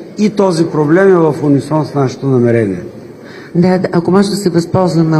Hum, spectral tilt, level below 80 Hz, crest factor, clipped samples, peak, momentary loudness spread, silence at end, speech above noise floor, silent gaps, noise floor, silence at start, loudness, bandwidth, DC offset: none; -7.5 dB/octave; -50 dBFS; 12 dB; under 0.1%; 0 dBFS; 11 LU; 0 s; 21 dB; none; -31 dBFS; 0 s; -12 LUFS; 12.5 kHz; under 0.1%